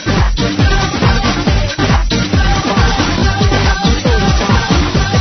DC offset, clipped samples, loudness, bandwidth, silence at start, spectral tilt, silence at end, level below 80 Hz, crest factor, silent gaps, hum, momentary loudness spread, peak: under 0.1%; under 0.1%; -13 LUFS; 6.4 kHz; 0 s; -5 dB/octave; 0 s; -16 dBFS; 12 dB; none; none; 2 LU; 0 dBFS